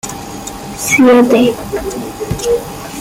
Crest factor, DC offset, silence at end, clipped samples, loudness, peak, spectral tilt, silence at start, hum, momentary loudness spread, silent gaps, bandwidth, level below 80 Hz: 12 dB; under 0.1%; 0 s; under 0.1%; -12 LUFS; 0 dBFS; -4.5 dB/octave; 0.05 s; none; 18 LU; none; 16.5 kHz; -36 dBFS